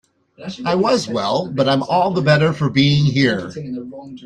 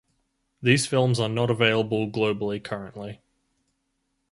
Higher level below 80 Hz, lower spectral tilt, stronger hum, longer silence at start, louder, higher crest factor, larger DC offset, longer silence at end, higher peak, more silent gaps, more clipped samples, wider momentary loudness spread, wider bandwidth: first, -52 dBFS vs -60 dBFS; about the same, -6 dB/octave vs -5 dB/octave; neither; second, 0.4 s vs 0.6 s; first, -17 LUFS vs -24 LUFS; second, 16 dB vs 22 dB; neither; second, 0 s vs 1.15 s; first, -2 dBFS vs -6 dBFS; neither; neither; about the same, 15 LU vs 14 LU; second, 9.8 kHz vs 11.5 kHz